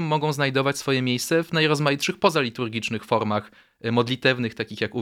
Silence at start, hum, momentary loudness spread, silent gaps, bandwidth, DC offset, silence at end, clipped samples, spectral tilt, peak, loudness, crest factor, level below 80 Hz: 0 s; none; 7 LU; none; 16.5 kHz; under 0.1%; 0 s; under 0.1%; -5 dB/octave; -4 dBFS; -23 LUFS; 20 dB; -66 dBFS